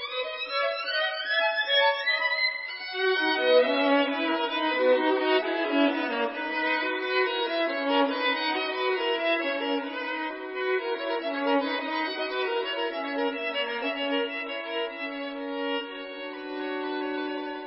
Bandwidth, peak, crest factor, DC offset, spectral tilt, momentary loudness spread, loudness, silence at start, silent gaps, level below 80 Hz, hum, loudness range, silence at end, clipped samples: 5.8 kHz; -10 dBFS; 18 dB; under 0.1%; -5.5 dB/octave; 9 LU; -27 LUFS; 0 s; none; -74 dBFS; none; 6 LU; 0 s; under 0.1%